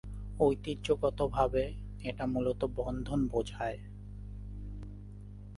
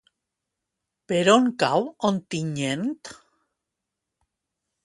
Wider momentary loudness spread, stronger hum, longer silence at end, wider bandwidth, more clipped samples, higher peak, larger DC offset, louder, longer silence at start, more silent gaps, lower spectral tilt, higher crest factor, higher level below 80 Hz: first, 17 LU vs 12 LU; first, 50 Hz at -45 dBFS vs none; second, 0 s vs 1.7 s; about the same, 11.5 kHz vs 11.5 kHz; neither; second, -14 dBFS vs -2 dBFS; neither; second, -33 LUFS vs -23 LUFS; second, 0.05 s vs 1.1 s; neither; first, -7 dB/octave vs -5 dB/octave; about the same, 20 dB vs 24 dB; first, -44 dBFS vs -70 dBFS